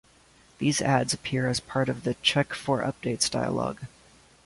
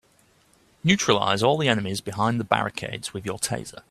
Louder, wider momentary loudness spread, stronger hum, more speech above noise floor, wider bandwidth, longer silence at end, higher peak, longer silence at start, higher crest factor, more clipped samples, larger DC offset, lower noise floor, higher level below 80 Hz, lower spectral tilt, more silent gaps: second, -27 LUFS vs -24 LUFS; second, 6 LU vs 11 LU; neither; second, 31 dB vs 37 dB; second, 11.5 kHz vs 14.5 kHz; first, 0.6 s vs 0.1 s; second, -8 dBFS vs 0 dBFS; second, 0.6 s vs 0.85 s; about the same, 20 dB vs 24 dB; neither; neither; about the same, -58 dBFS vs -61 dBFS; about the same, -56 dBFS vs -58 dBFS; about the same, -4 dB/octave vs -4 dB/octave; neither